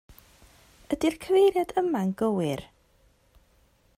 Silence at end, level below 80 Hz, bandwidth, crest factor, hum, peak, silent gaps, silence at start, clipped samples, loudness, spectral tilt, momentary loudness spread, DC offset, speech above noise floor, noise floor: 1.35 s; -58 dBFS; 16 kHz; 16 dB; none; -12 dBFS; none; 0.9 s; under 0.1%; -26 LUFS; -6.5 dB/octave; 10 LU; under 0.1%; 39 dB; -63 dBFS